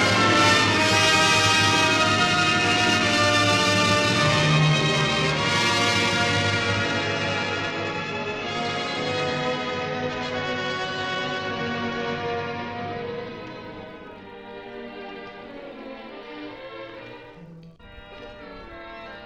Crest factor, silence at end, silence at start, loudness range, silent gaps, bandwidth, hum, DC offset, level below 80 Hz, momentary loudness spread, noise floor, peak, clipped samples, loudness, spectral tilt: 20 dB; 0 s; 0 s; 20 LU; none; 14 kHz; none; under 0.1%; -52 dBFS; 22 LU; -45 dBFS; -4 dBFS; under 0.1%; -21 LUFS; -3.5 dB/octave